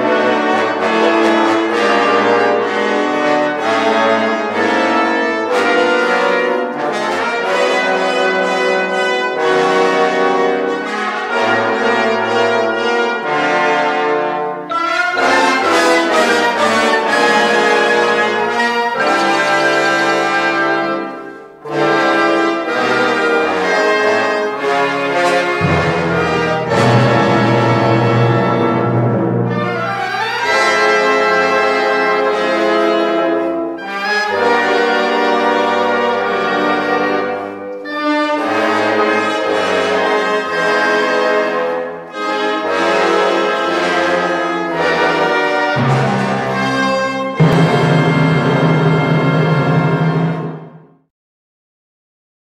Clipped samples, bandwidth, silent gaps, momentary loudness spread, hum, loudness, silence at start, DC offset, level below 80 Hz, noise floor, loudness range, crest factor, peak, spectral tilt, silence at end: under 0.1%; 14 kHz; none; 5 LU; none; -14 LUFS; 0 s; under 0.1%; -54 dBFS; -38 dBFS; 3 LU; 14 dB; 0 dBFS; -5.5 dB/octave; 1.75 s